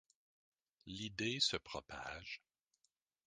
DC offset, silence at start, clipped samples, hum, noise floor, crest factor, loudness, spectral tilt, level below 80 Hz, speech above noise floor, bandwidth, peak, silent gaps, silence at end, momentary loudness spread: under 0.1%; 0.85 s; under 0.1%; none; -85 dBFS; 24 dB; -41 LUFS; -2.5 dB/octave; -70 dBFS; 42 dB; 10 kHz; -22 dBFS; none; 0.9 s; 17 LU